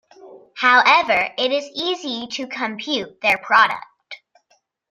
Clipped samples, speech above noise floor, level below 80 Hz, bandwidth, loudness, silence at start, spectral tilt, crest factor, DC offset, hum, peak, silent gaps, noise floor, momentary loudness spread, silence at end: under 0.1%; 45 dB; -64 dBFS; 14 kHz; -18 LUFS; 0.25 s; -2 dB/octave; 20 dB; under 0.1%; none; -2 dBFS; none; -64 dBFS; 25 LU; 0.75 s